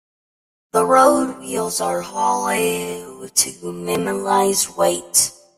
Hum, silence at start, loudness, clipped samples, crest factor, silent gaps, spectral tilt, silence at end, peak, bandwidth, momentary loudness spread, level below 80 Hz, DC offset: none; 0.75 s; -18 LUFS; under 0.1%; 20 dB; none; -2.5 dB/octave; 0.25 s; 0 dBFS; 16 kHz; 10 LU; -58 dBFS; under 0.1%